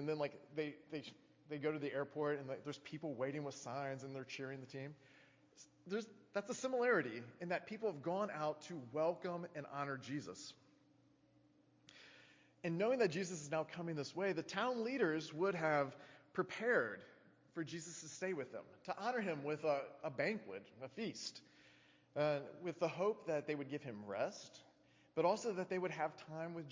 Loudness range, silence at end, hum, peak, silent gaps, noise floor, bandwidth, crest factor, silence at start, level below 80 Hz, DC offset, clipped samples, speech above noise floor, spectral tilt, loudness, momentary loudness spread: 7 LU; 0 s; none; -22 dBFS; none; -72 dBFS; 7.6 kHz; 20 dB; 0 s; -86 dBFS; under 0.1%; under 0.1%; 30 dB; -5 dB/octave; -42 LUFS; 14 LU